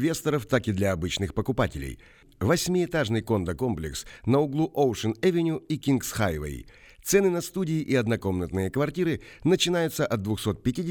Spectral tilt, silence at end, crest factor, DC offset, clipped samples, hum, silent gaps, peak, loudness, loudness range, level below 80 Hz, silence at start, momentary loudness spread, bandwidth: -5.5 dB/octave; 0 s; 18 dB; under 0.1%; under 0.1%; none; none; -8 dBFS; -26 LUFS; 1 LU; -48 dBFS; 0 s; 7 LU; over 20 kHz